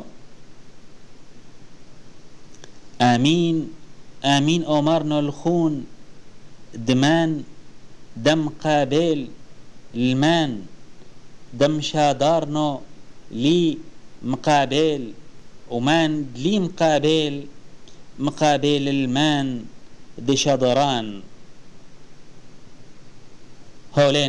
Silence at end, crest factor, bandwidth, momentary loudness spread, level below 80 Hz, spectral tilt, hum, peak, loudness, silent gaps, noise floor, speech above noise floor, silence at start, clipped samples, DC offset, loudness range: 0 s; 18 dB; 10.5 kHz; 16 LU; -50 dBFS; -5.5 dB/octave; none; -6 dBFS; -20 LUFS; none; -43 dBFS; 23 dB; 0 s; under 0.1%; 1%; 4 LU